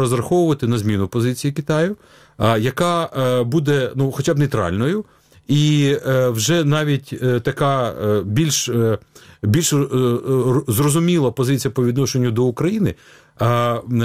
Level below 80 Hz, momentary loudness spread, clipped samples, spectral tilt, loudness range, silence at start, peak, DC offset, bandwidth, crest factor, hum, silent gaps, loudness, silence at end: -48 dBFS; 5 LU; under 0.1%; -5.5 dB/octave; 1 LU; 0 s; -2 dBFS; 0.2%; 16 kHz; 16 dB; none; none; -18 LUFS; 0 s